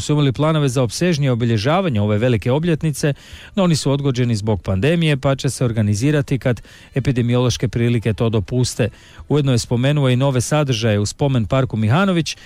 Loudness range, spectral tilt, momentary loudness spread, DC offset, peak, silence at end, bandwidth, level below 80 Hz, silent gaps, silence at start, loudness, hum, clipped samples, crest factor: 1 LU; -6 dB/octave; 4 LU; under 0.1%; -6 dBFS; 0.1 s; 15 kHz; -42 dBFS; none; 0 s; -18 LUFS; none; under 0.1%; 10 dB